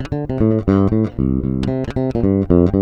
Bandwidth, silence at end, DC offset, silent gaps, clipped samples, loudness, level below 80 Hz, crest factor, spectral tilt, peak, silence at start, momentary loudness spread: 7.2 kHz; 0 s; under 0.1%; none; under 0.1%; -17 LUFS; -30 dBFS; 16 dB; -10 dB/octave; 0 dBFS; 0 s; 6 LU